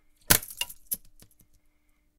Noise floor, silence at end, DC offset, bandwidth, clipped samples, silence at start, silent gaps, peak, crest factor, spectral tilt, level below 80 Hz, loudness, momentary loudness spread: -66 dBFS; 1.2 s; under 0.1%; 18 kHz; under 0.1%; 0.3 s; none; -4 dBFS; 28 dB; -1 dB/octave; -50 dBFS; -26 LUFS; 12 LU